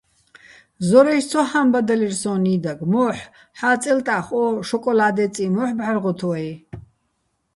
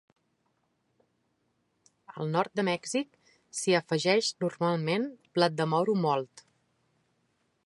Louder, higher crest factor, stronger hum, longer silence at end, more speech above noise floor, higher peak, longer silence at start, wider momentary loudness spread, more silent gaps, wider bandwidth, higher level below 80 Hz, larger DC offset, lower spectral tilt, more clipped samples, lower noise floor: first, -19 LUFS vs -29 LUFS; about the same, 20 dB vs 22 dB; neither; second, 0.75 s vs 1.25 s; first, 51 dB vs 47 dB; first, 0 dBFS vs -10 dBFS; second, 0.8 s vs 2.15 s; about the same, 8 LU vs 10 LU; neither; about the same, 11.5 kHz vs 11.5 kHz; first, -58 dBFS vs -80 dBFS; neither; about the same, -5.5 dB/octave vs -4.5 dB/octave; neither; second, -70 dBFS vs -75 dBFS